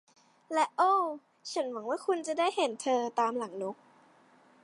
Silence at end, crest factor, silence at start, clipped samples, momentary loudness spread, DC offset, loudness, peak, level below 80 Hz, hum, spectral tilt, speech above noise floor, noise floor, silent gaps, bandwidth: 0.9 s; 18 dB; 0.5 s; under 0.1%; 12 LU; under 0.1%; -31 LUFS; -14 dBFS; under -90 dBFS; none; -3 dB/octave; 31 dB; -62 dBFS; none; 11.5 kHz